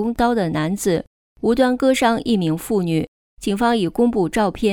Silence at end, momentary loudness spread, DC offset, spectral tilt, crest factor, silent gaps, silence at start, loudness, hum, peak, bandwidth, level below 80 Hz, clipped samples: 0 s; 8 LU; under 0.1%; -5.5 dB/octave; 16 dB; 1.07-1.36 s, 3.08-3.37 s; 0 s; -19 LUFS; none; -4 dBFS; 18.5 kHz; -44 dBFS; under 0.1%